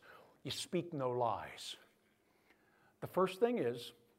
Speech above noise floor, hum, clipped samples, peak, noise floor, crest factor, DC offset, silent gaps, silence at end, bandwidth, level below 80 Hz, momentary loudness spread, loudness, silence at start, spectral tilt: 36 dB; none; under 0.1%; -20 dBFS; -74 dBFS; 22 dB; under 0.1%; none; 0.25 s; 16 kHz; -78 dBFS; 15 LU; -39 LUFS; 0.05 s; -5 dB/octave